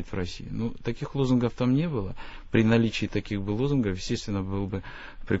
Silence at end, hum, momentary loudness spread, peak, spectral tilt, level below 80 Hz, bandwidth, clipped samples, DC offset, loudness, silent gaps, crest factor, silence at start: 0 s; none; 11 LU; -10 dBFS; -7 dB/octave; -42 dBFS; 8 kHz; under 0.1%; under 0.1%; -28 LUFS; none; 18 dB; 0 s